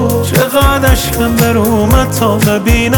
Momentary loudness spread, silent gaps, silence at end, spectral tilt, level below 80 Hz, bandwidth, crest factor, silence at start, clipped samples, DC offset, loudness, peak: 2 LU; none; 0 s; -5 dB/octave; -18 dBFS; over 20 kHz; 10 dB; 0 s; under 0.1%; under 0.1%; -10 LUFS; 0 dBFS